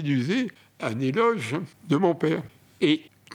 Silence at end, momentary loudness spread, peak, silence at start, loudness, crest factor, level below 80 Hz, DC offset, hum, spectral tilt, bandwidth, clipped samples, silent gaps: 0 s; 10 LU; -8 dBFS; 0 s; -26 LUFS; 18 dB; -74 dBFS; under 0.1%; none; -6.5 dB/octave; 14 kHz; under 0.1%; none